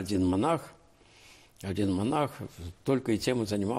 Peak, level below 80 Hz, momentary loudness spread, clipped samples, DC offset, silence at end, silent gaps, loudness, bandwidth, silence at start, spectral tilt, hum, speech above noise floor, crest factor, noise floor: -16 dBFS; -58 dBFS; 15 LU; under 0.1%; under 0.1%; 0 s; none; -30 LUFS; 16 kHz; 0 s; -6 dB/octave; none; 29 dB; 14 dB; -58 dBFS